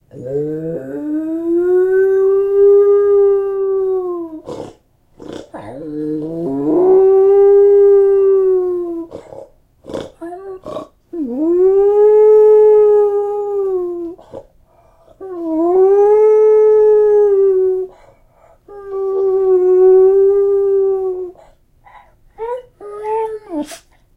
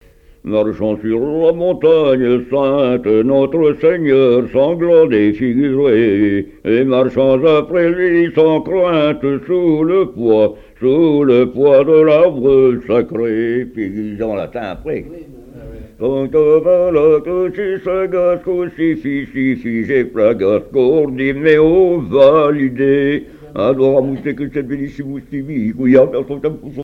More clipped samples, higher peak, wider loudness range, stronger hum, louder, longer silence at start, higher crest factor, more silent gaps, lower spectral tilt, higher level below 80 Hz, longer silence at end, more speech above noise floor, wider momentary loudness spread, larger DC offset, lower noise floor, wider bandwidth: neither; about the same, -2 dBFS vs 0 dBFS; first, 8 LU vs 5 LU; neither; about the same, -12 LUFS vs -14 LUFS; second, 0.15 s vs 0.45 s; about the same, 12 dB vs 14 dB; neither; about the same, -8 dB/octave vs -9 dB/octave; second, -50 dBFS vs -42 dBFS; first, 0.4 s vs 0 s; first, 29 dB vs 20 dB; first, 21 LU vs 11 LU; neither; first, -50 dBFS vs -33 dBFS; second, 3.8 kHz vs 5 kHz